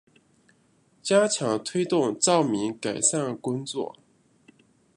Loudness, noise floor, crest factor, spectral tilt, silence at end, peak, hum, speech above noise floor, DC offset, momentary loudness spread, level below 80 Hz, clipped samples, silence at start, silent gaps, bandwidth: -25 LUFS; -64 dBFS; 20 dB; -3.5 dB/octave; 1.05 s; -8 dBFS; none; 39 dB; under 0.1%; 11 LU; -72 dBFS; under 0.1%; 1.05 s; none; 11.5 kHz